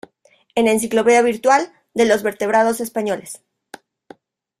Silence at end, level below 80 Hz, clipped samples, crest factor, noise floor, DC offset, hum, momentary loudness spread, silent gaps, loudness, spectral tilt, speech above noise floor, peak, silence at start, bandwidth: 1.25 s; -60 dBFS; under 0.1%; 18 dB; -57 dBFS; under 0.1%; none; 12 LU; none; -17 LUFS; -3.5 dB/octave; 41 dB; -2 dBFS; 0.55 s; 16 kHz